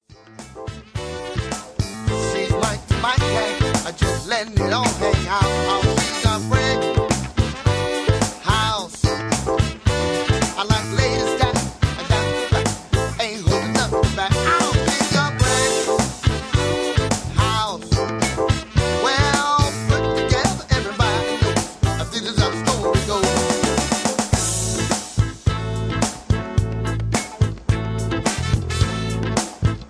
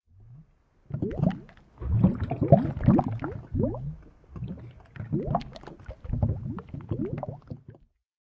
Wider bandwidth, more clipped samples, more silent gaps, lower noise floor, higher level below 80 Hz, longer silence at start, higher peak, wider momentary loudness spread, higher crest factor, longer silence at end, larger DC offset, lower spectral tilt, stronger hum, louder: first, 11 kHz vs 5.6 kHz; neither; neither; second, -41 dBFS vs -59 dBFS; first, -30 dBFS vs -40 dBFS; about the same, 0.25 s vs 0.2 s; about the same, -2 dBFS vs -4 dBFS; second, 5 LU vs 22 LU; second, 18 dB vs 26 dB; second, 0.05 s vs 0.5 s; neither; second, -4.5 dB/octave vs -11 dB/octave; neither; first, -20 LUFS vs -28 LUFS